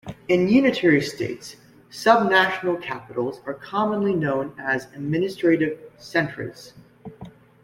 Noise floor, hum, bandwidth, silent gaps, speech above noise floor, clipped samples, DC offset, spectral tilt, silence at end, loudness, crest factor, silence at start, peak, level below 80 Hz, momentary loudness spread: -44 dBFS; none; 16 kHz; none; 22 dB; under 0.1%; under 0.1%; -6 dB/octave; 0.35 s; -22 LUFS; 22 dB; 0.05 s; -2 dBFS; -60 dBFS; 17 LU